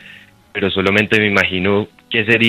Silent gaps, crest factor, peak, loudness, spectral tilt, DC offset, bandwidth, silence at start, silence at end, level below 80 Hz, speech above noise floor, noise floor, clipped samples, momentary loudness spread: none; 16 dB; 0 dBFS; -15 LUFS; -5.5 dB/octave; under 0.1%; 14.5 kHz; 0.05 s; 0 s; -54 dBFS; 27 dB; -42 dBFS; under 0.1%; 7 LU